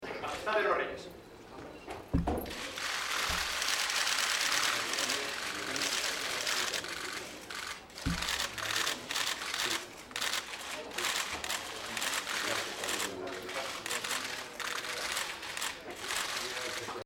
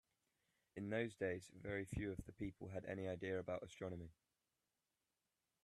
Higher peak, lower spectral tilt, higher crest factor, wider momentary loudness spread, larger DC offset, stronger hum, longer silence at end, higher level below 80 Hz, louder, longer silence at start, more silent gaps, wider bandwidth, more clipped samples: first, -14 dBFS vs -28 dBFS; second, -1.5 dB/octave vs -6.5 dB/octave; about the same, 22 dB vs 20 dB; about the same, 10 LU vs 8 LU; neither; neither; second, 0 s vs 1.55 s; first, -54 dBFS vs -68 dBFS; first, -33 LUFS vs -48 LUFS; second, 0 s vs 0.75 s; neither; first, 19.5 kHz vs 13 kHz; neither